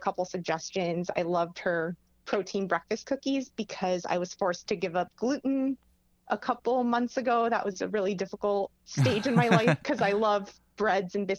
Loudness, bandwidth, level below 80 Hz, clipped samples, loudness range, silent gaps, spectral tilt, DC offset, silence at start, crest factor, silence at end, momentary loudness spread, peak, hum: -29 LUFS; 12.5 kHz; -66 dBFS; under 0.1%; 4 LU; none; -6 dB/octave; under 0.1%; 0 s; 20 dB; 0 s; 8 LU; -10 dBFS; none